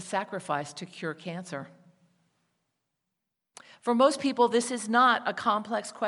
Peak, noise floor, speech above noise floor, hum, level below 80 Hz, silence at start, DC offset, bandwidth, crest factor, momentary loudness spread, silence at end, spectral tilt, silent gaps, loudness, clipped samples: -10 dBFS; -84 dBFS; 57 dB; none; -84 dBFS; 0 s; under 0.1%; 11.5 kHz; 20 dB; 15 LU; 0 s; -4 dB/octave; none; -27 LUFS; under 0.1%